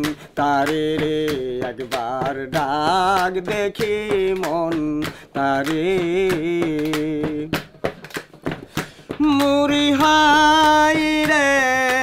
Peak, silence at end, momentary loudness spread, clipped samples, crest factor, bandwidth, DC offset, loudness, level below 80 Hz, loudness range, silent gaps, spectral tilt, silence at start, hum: -4 dBFS; 0 s; 14 LU; under 0.1%; 14 dB; 16 kHz; under 0.1%; -19 LUFS; -46 dBFS; 7 LU; none; -4 dB/octave; 0 s; none